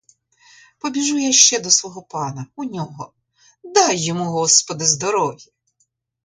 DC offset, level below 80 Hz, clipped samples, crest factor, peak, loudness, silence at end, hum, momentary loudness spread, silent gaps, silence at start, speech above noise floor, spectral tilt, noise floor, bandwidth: under 0.1%; -66 dBFS; under 0.1%; 20 dB; 0 dBFS; -16 LUFS; 0.85 s; none; 18 LU; none; 0.85 s; 49 dB; -2 dB/octave; -68 dBFS; 16 kHz